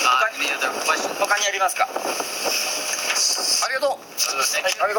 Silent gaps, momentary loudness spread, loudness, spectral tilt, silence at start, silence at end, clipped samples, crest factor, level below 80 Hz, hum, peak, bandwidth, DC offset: none; 5 LU; -20 LUFS; 1.5 dB/octave; 0 s; 0 s; under 0.1%; 18 dB; -70 dBFS; none; -4 dBFS; 18 kHz; under 0.1%